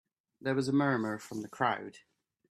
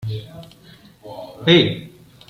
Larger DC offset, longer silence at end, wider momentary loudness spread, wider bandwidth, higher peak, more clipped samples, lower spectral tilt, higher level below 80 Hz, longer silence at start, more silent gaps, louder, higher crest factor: neither; about the same, 0.5 s vs 0.4 s; second, 12 LU vs 24 LU; second, 13.5 kHz vs 15 kHz; second, -14 dBFS vs -2 dBFS; neither; about the same, -6 dB/octave vs -6.5 dB/octave; second, -74 dBFS vs -56 dBFS; first, 0.45 s vs 0 s; neither; second, -33 LUFS vs -16 LUFS; about the same, 20 dB vs 20 dB